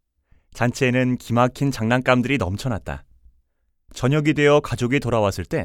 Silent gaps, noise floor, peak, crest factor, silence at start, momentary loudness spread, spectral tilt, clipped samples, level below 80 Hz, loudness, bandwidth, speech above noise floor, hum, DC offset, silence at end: none; -67 dBFS; -2 dBFS; 18 dB; 0.55 s; 10 LU; -6 dB/octave; under 0.1%; -44 dBFS; -20 LUFS; 16 kHz; 47 dB; none; under 0.1%; 0 s